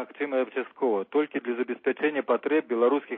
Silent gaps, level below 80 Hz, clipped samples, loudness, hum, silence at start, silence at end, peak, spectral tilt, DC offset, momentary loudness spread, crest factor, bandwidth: none; -88 dBFS; under 0.1%; -27 LUFS; none; 0 s; 0 s; -10 dBFS; -9 dB/octave; under 0.1%; 6 LU; 16 dB; 4 kHz